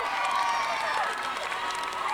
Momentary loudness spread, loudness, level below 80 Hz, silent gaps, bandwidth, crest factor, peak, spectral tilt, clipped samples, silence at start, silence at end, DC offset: 4 LU; -28 LUFS; -64 dBFS; none; over 20 kHz; 16 dB; -14 dBFS; -0.5 dB/octave; under 0.1%; 0 s; 0 s; under 0.1%